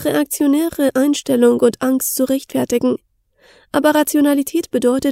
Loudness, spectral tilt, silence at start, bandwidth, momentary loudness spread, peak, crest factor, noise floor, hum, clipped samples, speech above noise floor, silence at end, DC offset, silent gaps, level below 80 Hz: -16 LUFS; -4 dB/octave; 0 s; 16 kHz; 5 LU; 0 dBFS; 16 dB; -52 dBFS; none; under 0.1%; 37 dB; 0 s; under 0.1%; none; -54 dBFS